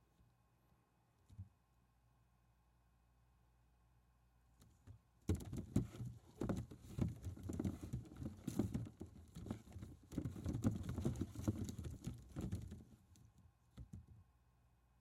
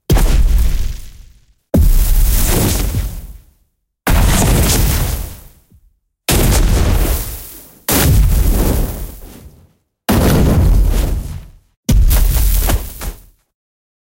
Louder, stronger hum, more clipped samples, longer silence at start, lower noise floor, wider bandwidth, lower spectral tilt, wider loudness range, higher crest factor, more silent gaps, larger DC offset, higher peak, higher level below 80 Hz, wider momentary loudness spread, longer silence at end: second, -47 LUFS vs -15 LUFS; neither; neither; first, 1.3 s vs 0.1 s; first, -77 dBFS vs -61 dBFS; about the same, 16 kHz vs 17 kHz; first, -7.5 dB/octave vs -5 dB/octave; first, 7 LU vs 2 LU; first, 26 dB vs 12 dB; second, none vs 11.77-11.83 s; neither; second, -24 dBFS vs -2 dBFS; second, -60 dBFS vs -16 dBFS; first, 19 LU vs 16 LU; second, 0.75 s vs 1.05 s